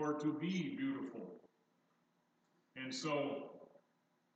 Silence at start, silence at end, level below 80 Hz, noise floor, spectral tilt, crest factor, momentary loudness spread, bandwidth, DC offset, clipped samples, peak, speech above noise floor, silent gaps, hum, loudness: 0 s; 0.7 s; under -90 dBFS; -79 dBFS; -5.5 dB/octave; 16 dB; 17 LU; 8.8 kHz; under 0.1%; under 0.1%; -28 dBFS; 38 dB; none; 60 Hz at -75 dBFS; -42 LUFS